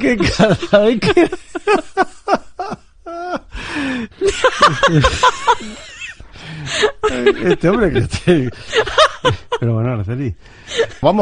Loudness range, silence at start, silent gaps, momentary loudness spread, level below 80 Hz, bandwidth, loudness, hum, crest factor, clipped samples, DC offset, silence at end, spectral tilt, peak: 3 LU; 0 s; none; 16 LU; -34 dBFS; 10.5 kHz; -15 LUFS; none; 16 dB; under 0.1%; under 0.1%; 0 s; -5 dB/octave; 0 dBFS